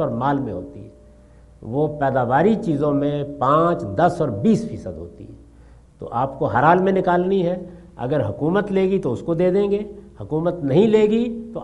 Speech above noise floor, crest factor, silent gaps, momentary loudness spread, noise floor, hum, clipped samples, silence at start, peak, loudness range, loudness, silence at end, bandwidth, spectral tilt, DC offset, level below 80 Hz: 28 dB; 20 dB; none; 16 LU; -47 dBFS; none; under 0.1%; 0 s; 0 dBFS; 2 LU; -20 LUFS; 0 s; 11 kHz; -8.5 dB/octave; under 0.1%; -48 dBFS